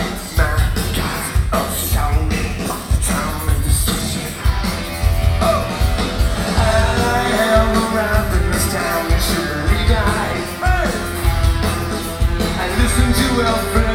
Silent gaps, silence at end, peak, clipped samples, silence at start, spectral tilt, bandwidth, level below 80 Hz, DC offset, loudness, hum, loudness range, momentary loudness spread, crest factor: none; 0 s; -2 dBFS; under 0.1%; 0 s; -4.5 dB/octave; 17 kHz; -20 dBFS; under 0.1%; -18 LUFS; none; 3 LU; 5 LU; 14 dB